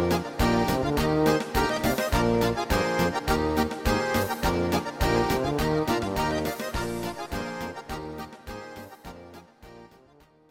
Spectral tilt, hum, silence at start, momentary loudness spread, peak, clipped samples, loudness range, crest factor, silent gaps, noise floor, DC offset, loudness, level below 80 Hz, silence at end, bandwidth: -5.5 dB/octave; none; 0 s; 16 LU; -10 dBFS; under 0.1%; 11 LU; 16 dB; none; -57 dBFS; under 0.1%; -26 LUFS; -38 dBFS; 0.65 s; 17 kHz